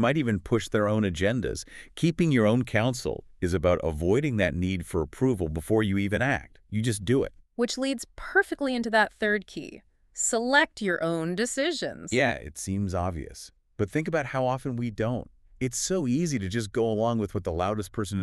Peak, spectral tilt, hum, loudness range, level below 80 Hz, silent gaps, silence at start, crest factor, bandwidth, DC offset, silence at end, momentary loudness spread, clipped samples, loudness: -8 dBFS; -5 dB/octave; none; 3 LU; -48 dBFS; none; 0 s; 20 dB; 13.5 kHz; under 0.1%; 0 s; 10 LU; under 0.1%; -27 LUFS